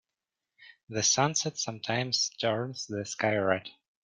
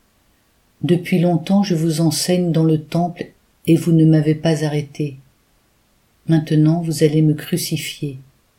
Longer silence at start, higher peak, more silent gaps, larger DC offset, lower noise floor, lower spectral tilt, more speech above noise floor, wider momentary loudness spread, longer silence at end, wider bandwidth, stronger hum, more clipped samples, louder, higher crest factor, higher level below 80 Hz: second, 0.6 s vs 0.8 s; second, -10 dBFS vs -2 dBFS; first, 0.83-0.87 s vs none; neither; first, -89 dBFS vs -59 dBFS; second, -2.5 dB/octave vs -6.5 dB/octave; first, 59 dB vs 43 dB; second, 10 LU vs 13 LU; about the same, 0.3 s vs 0.35 s; second, 11 kHz vs 16 kHz; neither; neither; second, -29 LUFS vs -17 LUFS; first, 22 dB vs 16 dB; second, -72 dBFS vs -56 dBFS